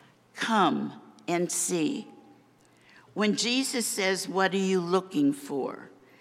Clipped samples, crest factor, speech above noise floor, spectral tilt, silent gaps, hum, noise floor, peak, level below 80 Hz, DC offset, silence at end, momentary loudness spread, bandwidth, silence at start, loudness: under 0.1%; 18 dB; 33 dB; -3.5 dB/octave; none; none; -60 dBFS; -10 dBFS; -82 dBFS; under 0.1%; 0.3 s; 14 LU; 15.5 kHz; 0.35 s; -27 LUFS